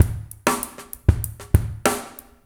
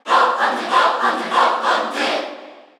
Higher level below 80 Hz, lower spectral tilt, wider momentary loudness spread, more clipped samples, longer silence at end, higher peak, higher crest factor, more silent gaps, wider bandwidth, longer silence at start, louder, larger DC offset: first, -30 dBFS vs -86 dBFS; first, -5 dB/octave vs -1.5 dB/octave; about the same, 8 LU vs 8 LU; neither; about the same, 0.3 s vs 0.2 s; about the same, 0 dBFS vs -2 dBFS; first, 22 dB vs 16 dB; neither; first, over 20 kHz vs 13 kHz; about the same, 0 s vs 0.05 s; second, -24 LUFS vs -17 LUFS; neither